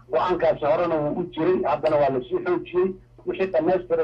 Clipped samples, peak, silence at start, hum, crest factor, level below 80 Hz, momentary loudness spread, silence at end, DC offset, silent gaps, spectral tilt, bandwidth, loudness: under 0.1%; -10 dBFS; 0.1 s; none; 12 dB; -52 dBFS; 6 LU; 0 s; under 0.1%; none; -8.5 dB/octave; 6 kHz; -23 LUFS